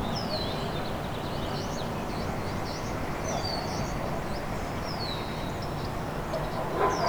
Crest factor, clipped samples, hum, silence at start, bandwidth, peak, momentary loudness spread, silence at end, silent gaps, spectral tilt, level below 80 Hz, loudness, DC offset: 18 dB; under 0.1%; none; 0 s; over 20 kHz; -12 dBFS; 3 LU; 0 s; none; -5 dB/octave; -42 dBFS; -32 LUFS; under 0.1%